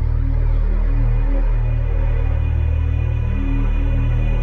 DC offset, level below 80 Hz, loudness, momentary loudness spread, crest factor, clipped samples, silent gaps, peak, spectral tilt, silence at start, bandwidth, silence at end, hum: under 0.1%; -18 dBFS; -21 LUFS; 2 LU; 8 dB; under 0.1%; none; -8 dBFS; -9.5 dB/octave; 0 s; 3.6 kHz; 0 s; none